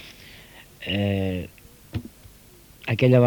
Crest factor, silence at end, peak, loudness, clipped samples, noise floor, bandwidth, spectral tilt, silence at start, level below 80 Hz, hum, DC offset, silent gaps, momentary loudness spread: 20 dB; 0 s; -6 dBFS; -26 LUFS; under 0.1%; -50 dBFS; over 20 kHz; -7.5 dB/octave; 0 s; -52 dBFS; none; under 0.1%; none; 22 LU